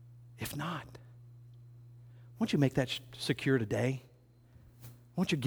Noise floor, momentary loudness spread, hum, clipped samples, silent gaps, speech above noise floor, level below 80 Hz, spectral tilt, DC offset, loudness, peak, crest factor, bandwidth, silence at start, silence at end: -60 dBFS; 25 LU; 60 Hz at -55 dBFS; under 0.1%; none; 28 dB; -64 dBFS; -6 dB/octave; under 0.1%; -34 LUFS; -14 dBFS; 22 dB; over 20 kHz; 0 s; 0 s